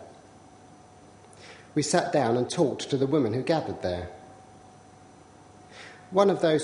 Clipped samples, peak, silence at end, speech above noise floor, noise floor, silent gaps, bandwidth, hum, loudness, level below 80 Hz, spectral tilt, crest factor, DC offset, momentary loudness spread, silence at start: under 0.1%; -6 dBFS; 0 s; 27 dB; -52 dBFS; none; 10.5 kHz; none; -26 LUFS; -62 dBFS; -5.5 dB/octave; 22 dB; under 0.1%; 24 LU; 0 s